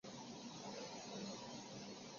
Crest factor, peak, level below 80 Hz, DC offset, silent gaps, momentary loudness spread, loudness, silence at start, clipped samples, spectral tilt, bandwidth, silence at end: 14 dB; -38 dBFS; -82 dBFS; under 0.1%; none; 3 LU; -51 LUFS; 0.05 s; under 0.1%; -3.5 dB/octave; 7.4 kHz; 0 s